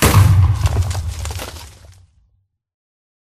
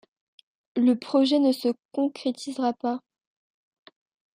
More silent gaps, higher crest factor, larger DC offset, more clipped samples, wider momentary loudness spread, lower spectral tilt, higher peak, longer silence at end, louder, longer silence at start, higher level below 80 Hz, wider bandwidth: second, none vs 1.85-1.89 s; about the same, 18 dB vs 16 dB; neither; neither; first, 19 LU vs 9 LU; about the same, -5 dB/octave vs -5 dB/octave; first, 0 dBFS vs -10 dBFS; first, 1.6 s vs 1.35 s; first, -16 LUFS vs -25 LUFS; second, 0 s vs 0.75 s; first, -26 dBFS vs -82 dBFS; about the same, 15.5 kHz vs 15 kHz